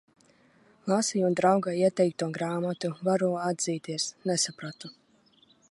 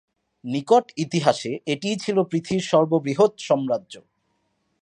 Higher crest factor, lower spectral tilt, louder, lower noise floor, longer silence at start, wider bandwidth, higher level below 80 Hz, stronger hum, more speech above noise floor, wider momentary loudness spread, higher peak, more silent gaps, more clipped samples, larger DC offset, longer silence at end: about the same, 20 dB vs 20 dB; about the same, -4.5 dB/octave vs -5.5 dB/octave; second, -28 LUFS vs -22 LUFS; second, -63 dBFS vs -71 dBFS; first, 0.85 s vs 0.45 s; about the same, 11.5 kHz vs 11 kHz; second, -76 dBFS vs -66 dBFS; neither; second, 36 dB vs 49 dB; first, 13 LU vs 8 LU; second, -8 dBFS vs -4 dBFS; neither; neither; neither; about the same, 0.8 s vs 0.8 s